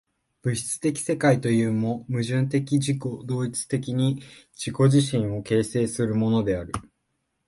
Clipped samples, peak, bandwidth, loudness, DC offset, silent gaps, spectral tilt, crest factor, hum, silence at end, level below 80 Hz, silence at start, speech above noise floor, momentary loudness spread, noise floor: under 0.1%; -8 dBFS; 12 kHz; -24 LUFS; under 0.1%; none; -6 dB/octave; 16 dB; none; 0.65 s; -54 dBFS; 0.45 s; 52 dB; 9 LU; -76 dBFS